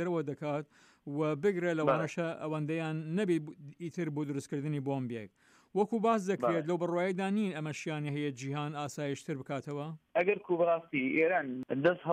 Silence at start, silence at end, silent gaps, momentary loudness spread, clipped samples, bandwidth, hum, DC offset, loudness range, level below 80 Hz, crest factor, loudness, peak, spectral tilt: 0 s; 0 s; none; 10 LU; under 0.1%; 14.5 kHz; none; under 0.1%; 3 LU; -80 dBFS; 18 dB; -33 LUFS; -16 dBFS; -6.5 dB/octave